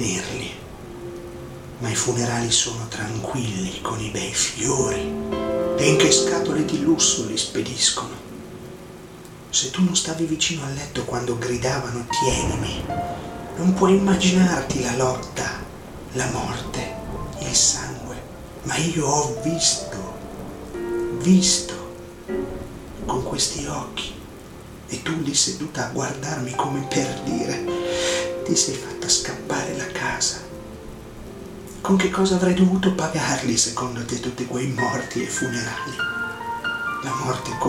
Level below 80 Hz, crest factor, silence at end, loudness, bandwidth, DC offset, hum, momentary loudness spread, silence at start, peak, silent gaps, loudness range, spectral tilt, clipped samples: -44 dBFS; 20 dB; 0 s; -22 LUFS; 16 kHz; under 0.1%; none; 19 LU; 0 s; -4 dBFS; none; 5 LU; -3.5 dB/octave; under 0.1%